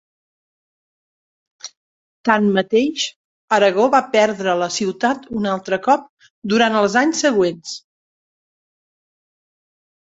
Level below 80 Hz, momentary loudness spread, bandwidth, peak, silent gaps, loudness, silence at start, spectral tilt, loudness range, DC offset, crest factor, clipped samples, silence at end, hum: -62 dBFS; 17 LU; 8 kHz; 0 dBFS; 1.77-2.24 s, 3.16-3.48 s, 6.09-6.17 s, 6.30-6.42 s; -17 LUFS; 1.65 s; -4 dB/octave; 4 LU; under 0.1%; 20 dB; under 0.1%; 2.35 s; none